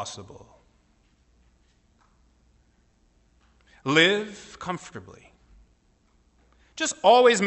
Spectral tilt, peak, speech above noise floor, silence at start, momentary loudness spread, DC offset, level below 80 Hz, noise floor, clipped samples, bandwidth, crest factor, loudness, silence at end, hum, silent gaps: -3 dB/octave; -6 dBFS; 41 dB; 0 s; 26 LU; under 0.1%; -62 dBFS; -64 dBFS; under 0.1%; 8.4 kHz; 22 dB; -22 LUFS; 0 s; none; none